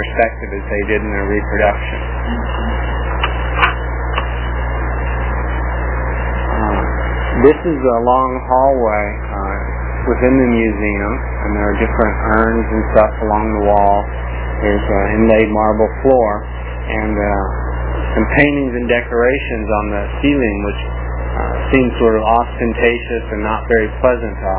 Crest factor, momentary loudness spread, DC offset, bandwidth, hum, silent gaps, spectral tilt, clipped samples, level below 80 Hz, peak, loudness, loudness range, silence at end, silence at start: 14 dB; 9 LU; under 0.1%; 4 kHz; 60 Hz at -20 dBFS; none; -10.5 dB/octave; under 0.1%; -22 dBFS; 0 dBFS; -16 LUFS; 4 LU; 0 s; 0 s